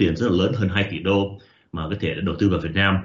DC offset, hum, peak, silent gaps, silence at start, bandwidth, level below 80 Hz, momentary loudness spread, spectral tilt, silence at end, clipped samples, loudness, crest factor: under 0.1%; none; -6 dBFS; none; 0 s; 7.4 kHz; -44 dBFS; 10 LU; -5 dB/octave; 0 s; under 0.1%; -22 LUFS; 16 dB